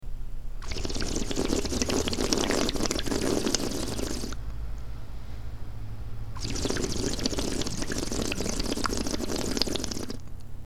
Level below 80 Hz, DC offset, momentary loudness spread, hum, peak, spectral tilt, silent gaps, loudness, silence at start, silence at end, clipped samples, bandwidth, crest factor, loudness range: -36 dBFS; 2%; 15 LU; none; -4 dBFS; -3.5 dB/octave; none; -30 LUFS; 0 s; 0 s; under 0.1%; 16.5 kHz; 26 dB; 6 LU